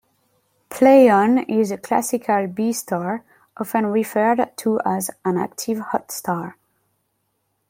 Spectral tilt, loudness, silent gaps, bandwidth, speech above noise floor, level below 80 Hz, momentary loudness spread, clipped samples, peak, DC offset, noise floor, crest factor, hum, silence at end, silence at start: -5.5 dB/octave; -19 LUFS; none; 16.5 kHz; 52 dB; -66 dBFS; 13 LU; under 0.1%; -2 dBFS; under 0.1%; -71 dBFS; 18 dB; none; 1.2 s; 0.7 s